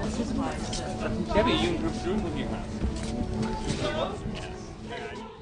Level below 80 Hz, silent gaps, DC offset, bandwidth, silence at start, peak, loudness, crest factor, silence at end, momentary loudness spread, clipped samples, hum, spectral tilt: -38 dBFS; none; under 0.1%; 10.5 kHz; 0 s; -10 dBFS; -30 LUFS; 20 dB; 0 s; 12 LU; under 0.1%; none; -5.5 dB/octave